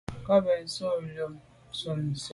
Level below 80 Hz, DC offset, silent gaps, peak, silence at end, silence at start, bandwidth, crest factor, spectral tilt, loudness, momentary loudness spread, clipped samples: -58 dBFS; under 0.1%; none; -12 dBFS; 0 s; 0.1 s; 11.5 kHz; 18 dB; -5.5 dB/octave; -30 LUFS; 13 LU; under 0.1%